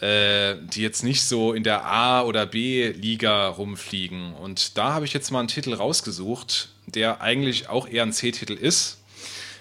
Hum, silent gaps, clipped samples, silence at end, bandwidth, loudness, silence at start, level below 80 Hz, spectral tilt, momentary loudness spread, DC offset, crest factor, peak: none; none; under 0.1%; 0 s; 16 kHz; -23 LUFS; 0 s; -64 dBFS; -3 dB/octave; 11 LU; under 0.1%; 20 dB; -4 dBFS